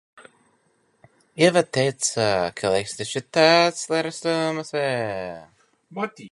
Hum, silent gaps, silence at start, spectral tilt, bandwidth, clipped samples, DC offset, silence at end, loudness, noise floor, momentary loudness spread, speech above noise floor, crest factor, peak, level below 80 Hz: none; none; 0.2 s; -3.5 dB/octave; 11.5 kHz; under 0.1%; under 0.1%; 0.05 s; -22 LUFS; -65 dBFS; 14 LU; 43 dB; 20 dB; -2 dBFS; -60 dBFS